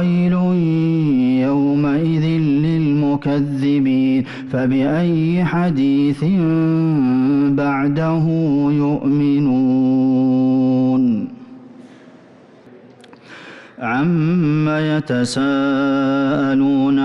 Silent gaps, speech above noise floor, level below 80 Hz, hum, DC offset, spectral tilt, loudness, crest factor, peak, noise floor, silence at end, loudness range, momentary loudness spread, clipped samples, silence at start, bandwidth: none; 29 dB; -50 dBFS; none; under 0.1%; -8 dB/octave; -16 LUFS; 8 dB; -8 dBFS; -45 dBFS; 0 s; 5 LU; 3 LU; under 0.1%; 0 s; 10.5 kHz